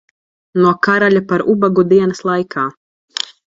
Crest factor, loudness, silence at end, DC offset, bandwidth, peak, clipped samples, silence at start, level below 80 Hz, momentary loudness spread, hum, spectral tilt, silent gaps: 14 dB; -14 LUFS; 0.35 s; under 0.1%; 7.8 kHz; 0 dBFS; under 0.1%; 0.55 s; -56 dBFS; 12 LU; none; -6 dB/octave; 2.77-3.08 s